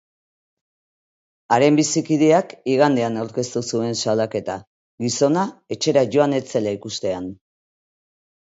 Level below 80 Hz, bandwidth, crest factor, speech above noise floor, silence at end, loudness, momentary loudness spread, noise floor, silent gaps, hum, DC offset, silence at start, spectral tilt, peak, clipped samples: -62 dBFS; 8 kHz; 18 dB; over 71 dB; 1.2 s; -20 LUFS; 11 LU; under -90 dBFS; 4.67-4.98 s; none; under 0.1%; 1.5 s; -5 dB/octave; -2 dBFS; under 0.1%